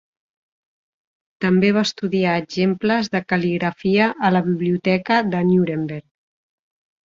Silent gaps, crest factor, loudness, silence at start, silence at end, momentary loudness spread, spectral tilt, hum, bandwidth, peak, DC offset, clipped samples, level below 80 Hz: none; 18 dB; -19 LUFS; 1.4 s; 1.05 s; 5 LU; -6.5 dB/octave; none; 7.6 kHz; -2 dBFS; under 0.1%; under 0.1%; -58 dBFS